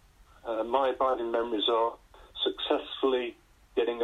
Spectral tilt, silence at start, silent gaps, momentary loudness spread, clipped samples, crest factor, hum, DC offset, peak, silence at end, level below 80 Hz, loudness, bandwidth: -4.5 dB/octave; 0.45 s; none; 9 LU; under 0.1%; 18 dB; none; under 0.1%; -12 dBFS; 0 s; -60 dBFS; -29 LUFS; 10 kHz